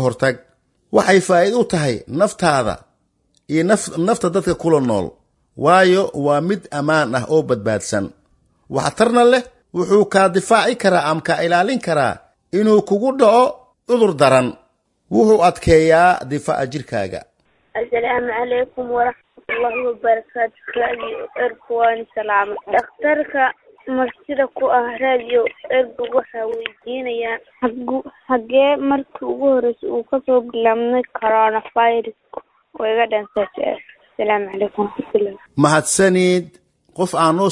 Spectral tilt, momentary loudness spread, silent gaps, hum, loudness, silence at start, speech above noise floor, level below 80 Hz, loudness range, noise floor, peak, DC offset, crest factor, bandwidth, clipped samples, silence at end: -5 dB/octave; 11 LU; none; none; -17 LUFS; 0 s; 47 dB; -48 dBFS; 5 LU; -64 dBFS; 0 dBFS; under 0.1%; 16 dB; 11.5 kHz; under 0.1%; 0 s